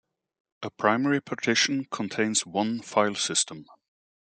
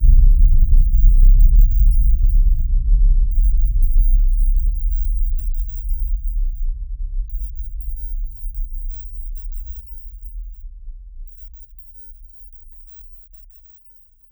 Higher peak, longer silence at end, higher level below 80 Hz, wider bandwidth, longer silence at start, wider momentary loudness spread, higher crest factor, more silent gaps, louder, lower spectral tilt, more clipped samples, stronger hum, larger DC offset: second, -6 dBFS vs -2 dBFS; second, 0.75 s vs 1.3 s; second, -76 dBFS vs -16 dBFS; second, 9.6 kHz vs over 20 kHz; first, 0.6 s vs 0 s; second, 9 LU vs 24 LU; first, 22 dB vs 14 dB; neither; second, -26 LUFS vs -21 LUFS; second, -2.5 dB/octave vs -15 dB/octave; neither; neither; neither